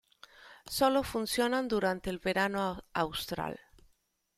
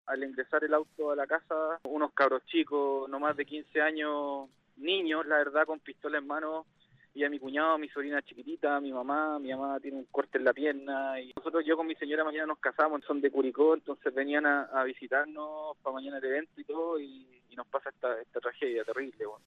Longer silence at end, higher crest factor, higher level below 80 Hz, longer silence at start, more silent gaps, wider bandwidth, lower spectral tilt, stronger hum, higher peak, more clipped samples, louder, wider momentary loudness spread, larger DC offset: first, 0.8 s vs 0.1 s; about the same, 20 dB vs 20 dB; first, -58 dBFS vs -82 dBFS; first, 0.4 s vs 0.05 s; neither; first, 16 kHz vs 6 kHz; second, -4 dB/octave vs -5.5 dB/octave; neither; about the same, -14 dBFS vs -12 dBFS; neither; about the same, -32 LUFS vs -32 LUFS; about the same, 10 LU vs 10 LU; neither